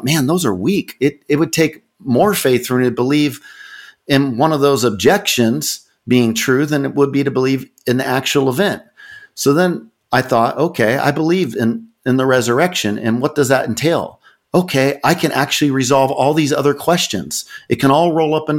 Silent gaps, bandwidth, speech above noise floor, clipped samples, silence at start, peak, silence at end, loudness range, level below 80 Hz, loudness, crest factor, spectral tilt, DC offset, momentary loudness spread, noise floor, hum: none; 17 kHz; 25 dB; under 0.1%; 0 s; 0 dBFS; 0 s; 2 LU; -54 dBFS; -15 LUFS; 14 dB; -5 dB/octave; under 0.1%; 7 LU; -40 dBFS; none